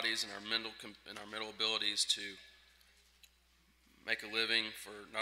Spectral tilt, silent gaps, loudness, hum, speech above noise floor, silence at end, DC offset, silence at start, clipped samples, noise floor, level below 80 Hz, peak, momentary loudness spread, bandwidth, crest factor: 0 dB/octave; none; -36 LUFS; none; 31 dB; 0 s; under 0.1%; 0 s; under 0.1%; -70 dBFS; -74 dBFS; -18 dBFS; 16 LU; 16 kHz; 24 dB